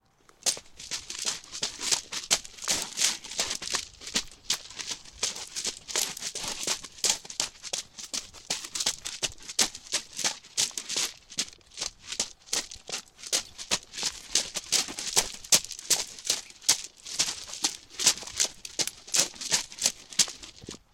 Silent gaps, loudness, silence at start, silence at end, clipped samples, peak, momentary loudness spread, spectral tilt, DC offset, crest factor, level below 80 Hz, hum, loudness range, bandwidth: none; -29 LUFS; 0.45 s; 0.15 s; under 0.1%; -4 dBFS; 9 LU; 1 dB/octave; under 0.1%; 26 dB; -60 dBFS; none; 5 LU; 17 kHz